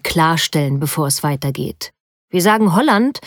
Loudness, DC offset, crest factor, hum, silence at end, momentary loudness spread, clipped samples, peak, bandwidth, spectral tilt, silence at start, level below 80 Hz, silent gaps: -16 LUFS; under 0.1%; 14 dB; none; 0 s; 12 LU; under 0.1%; -2 dBFS; over 20 kHz; -4.5 dB/octave; 0.05 s; -48 dBFS; 2.00-2.28 s